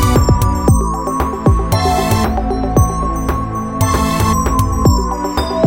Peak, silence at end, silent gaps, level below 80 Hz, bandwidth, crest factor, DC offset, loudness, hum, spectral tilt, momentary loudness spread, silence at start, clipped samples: 0 dBFS; 0 s; none; -20 dBFS; 17 kHz; 14 dB; under 0.1%; -15 LUFS; none; -6 dB/octave; 5 LU; 0 s; under 0.1%